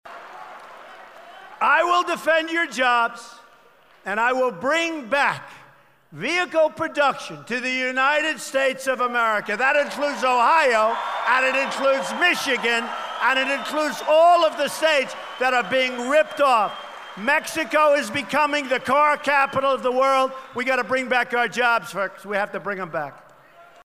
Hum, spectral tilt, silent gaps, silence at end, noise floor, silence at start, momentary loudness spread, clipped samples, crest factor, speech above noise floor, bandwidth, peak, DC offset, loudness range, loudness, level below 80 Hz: none; -2.5 dB/octave; none; 0.25 s; -54 dBFS; 0.05 s; 10 LU; under 0.1%; 16 dB; 33 dB; 15.5 kHz; -6 dBFS; 0.1%; 4 LU; -21 LUFS; -66 dBFS